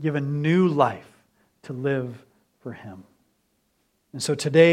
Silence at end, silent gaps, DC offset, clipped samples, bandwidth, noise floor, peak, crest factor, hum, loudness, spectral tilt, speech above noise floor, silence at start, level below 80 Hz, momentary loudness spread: 0 s; none; under 0.1%; under 0.1%; 13 kHz; -70 dBFS; -4 dBFS; 22 dB; none; -23 LUFS; -6 dB/octave; 48 dB; 0 s; -70 dBFS; 22 LU